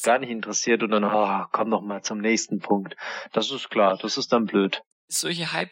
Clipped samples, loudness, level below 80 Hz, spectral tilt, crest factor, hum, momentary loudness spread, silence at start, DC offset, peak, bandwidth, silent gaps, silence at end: under 0.1%; -24 LUFS; -82 dBFS; -3.5 dB/octave; 18 dB; none; 6 LU; 0 s; under 0.1%; -6 dBFS; 16.5 kHz; 4.86-5.08 s; 0.05 s